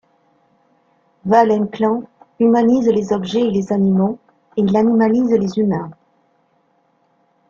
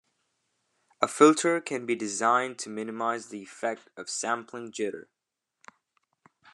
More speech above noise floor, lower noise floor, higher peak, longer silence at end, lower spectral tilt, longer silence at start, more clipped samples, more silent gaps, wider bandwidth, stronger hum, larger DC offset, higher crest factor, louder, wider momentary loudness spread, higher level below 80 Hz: second, 46 dB vs 57 dB; second, -61 dBFS vs -85 dBFS; about the same, -2 dBFS vs -4 dBFS; about the same, 1.6 s vs 1.5 s; first, -8 dB/octave vs -3.5 dB/octave; first, 1.25 s vs 1 s; neither; neither; second, 7.2 kHz vs 12 kHz; neither; neither; second, 16 dB vs 26 dB; first, -16 LUFS vs -27 LUFS; second, 11 LU vs 15 LU; first, -56 dBFS vs -86 dBFS